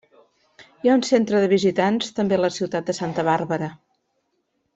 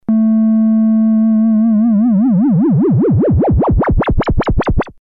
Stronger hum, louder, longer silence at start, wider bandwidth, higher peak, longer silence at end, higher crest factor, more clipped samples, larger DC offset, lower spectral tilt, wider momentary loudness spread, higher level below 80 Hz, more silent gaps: neither; second, -21 LUFS vs -12 LUFS; first, 0.6 s vs 0.1 s; first, 8.2 kHz vs 5 kHz; about the same, -4 dBFS vs -4 dBFS; first, 1 s vs 0.1 s; first, 18 dB vs 8 dB; neither; second, under 0.1% vs 0.3%; second, -5.5 dB/octave vs -10.5 dB/octave; first, 8 LU vs 4 LU; second, -64 dBFS vs -22 dBFS; neither